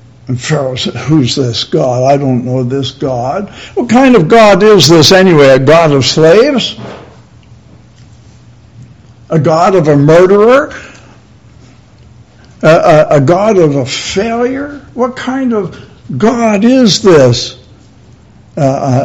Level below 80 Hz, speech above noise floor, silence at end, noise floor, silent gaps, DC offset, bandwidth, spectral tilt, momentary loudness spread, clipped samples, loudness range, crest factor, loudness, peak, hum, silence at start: -40 dBFS; 31 dB; 0 s; -39 dBFS; none; 0.3%; 18 kHz; -5.5 dB/octave; 13 LU; 3%; 7 LU; 8 dB; -8 LUFS; 0 dBFS; none; 0.3 s